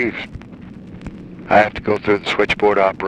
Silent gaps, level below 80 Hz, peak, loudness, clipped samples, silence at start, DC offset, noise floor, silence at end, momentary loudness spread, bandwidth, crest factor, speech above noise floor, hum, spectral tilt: none; -44 dBFS; 0 dBFS; -16 LUFS; under 0.1%; 0 s; under 0.1%; -36 dBFS; 0 s; 22 LU; 9.2 kHz; 18 dB; 19 dB; none; -5.5 dB/octave